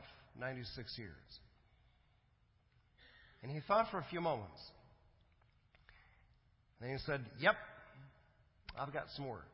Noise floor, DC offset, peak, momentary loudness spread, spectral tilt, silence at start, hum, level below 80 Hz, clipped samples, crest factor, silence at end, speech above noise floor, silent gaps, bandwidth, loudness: -74 dBFS; under 0.1%; -18 dBFS; 23 LU; -3.5 dB/octave; 0 s; none; -66 dBFS; under 0.1%; 28 dB; 0 s; 33 dB; none; 5.6 kHz; -41 LUFS